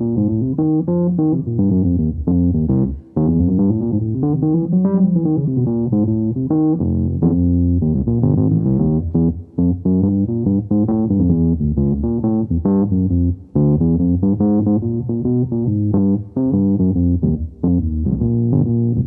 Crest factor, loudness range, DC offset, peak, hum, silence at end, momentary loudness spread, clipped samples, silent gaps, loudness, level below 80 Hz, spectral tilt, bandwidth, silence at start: 12 dB; 1 LU; under 0.1%; -2 dBFS; none; 0 s; 3 LU; under 0.1%; none; -17 LUFS; -32 dBFS; -16 dB/octave; 1.7 kHz; 0 s